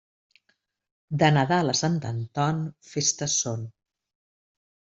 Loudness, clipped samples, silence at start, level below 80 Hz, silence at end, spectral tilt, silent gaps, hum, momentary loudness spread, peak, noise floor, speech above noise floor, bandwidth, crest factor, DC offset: -25 LUFS; under 0.1%; 1.1 s; -62 dBFS; 1.2 s; -4 dB/octave; none; none; 12 LU; -4 dBFS; -72 dBFS; 48 dB; 8.2 kHz; 22 dB; under 0.1%